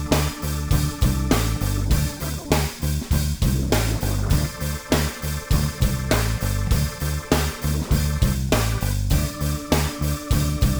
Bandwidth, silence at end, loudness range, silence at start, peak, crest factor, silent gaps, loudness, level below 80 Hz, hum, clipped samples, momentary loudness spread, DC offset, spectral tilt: over 20 kHz; 0 s; 1 LU; 0 s; -4 dBFS; 18 dB; none; -23 LUFS; -26 dBFS; none; under 0.1%; 5 LU; under 0.1%; -5 dB/octave